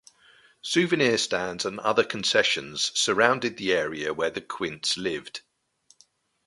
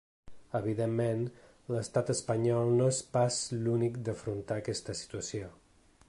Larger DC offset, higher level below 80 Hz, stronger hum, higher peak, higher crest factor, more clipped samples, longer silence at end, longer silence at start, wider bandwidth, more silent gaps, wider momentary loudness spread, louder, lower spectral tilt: neither; about the same, -64 dBFS vs -62 dBFS; neither; first, -2 dBFS vs -16 dBFS; first, 24 dB vs 16 dB; neither; first, 1.05 s vs 0.55 s; first, 0.65 s vs 0.25 s; about the same, 11.5 kHz vs 11.5 kHz; neither; about the same, 10 LU vs 11 LU; first, -25 LUFS vs -32 LUFS; second, -2.5 dB/octave vs -5.5 dB/octave